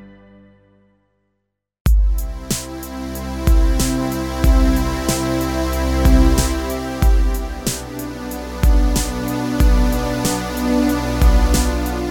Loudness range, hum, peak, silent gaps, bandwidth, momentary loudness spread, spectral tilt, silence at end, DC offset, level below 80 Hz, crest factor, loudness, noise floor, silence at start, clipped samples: 4 LU; 50 Hz at -25 dBFS; 0 dBFS; 1.80-1.85 s; 18 kHz; 10 LU; -5.5 dB/octave; 0 s; under 0.1%; -18 dBFS; 16 dB; -19 LUFS; -74 dBFS; 0 s; under 0.1%